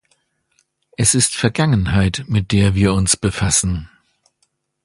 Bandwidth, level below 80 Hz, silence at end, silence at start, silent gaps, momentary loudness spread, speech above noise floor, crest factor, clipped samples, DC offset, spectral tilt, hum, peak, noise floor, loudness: 11.5 kHz; -34 dBFS; 1 s; 1 s; none; 4 LU; 51 dB; 18 dB; under 0.1%; under 0.1%; -4 dB/octave; none; 0 dBFS; -67 dBFS; -16 LUFS